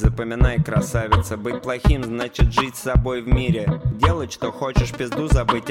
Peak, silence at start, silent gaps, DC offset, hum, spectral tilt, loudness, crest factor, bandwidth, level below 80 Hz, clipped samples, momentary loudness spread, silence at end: -2 dBFS; 0 s; none; under 0.1%; none; -6.5 dB/octave; -21 LUFS; 18 dB; 16 kHz; -24 dBFS; under 0.1%; 6 LU; 0 s